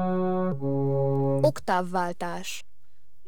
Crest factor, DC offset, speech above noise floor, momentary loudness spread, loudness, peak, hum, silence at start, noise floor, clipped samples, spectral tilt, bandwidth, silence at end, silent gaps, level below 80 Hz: 18 dB; 2%; 37 dB; 10 LU; -27 LUFS; -8 dBFS; none; 0 s; -66 dBFS; under 0.1%; -7 dB/octave; 18 kHz; 0.65 s; none; -64 dBFS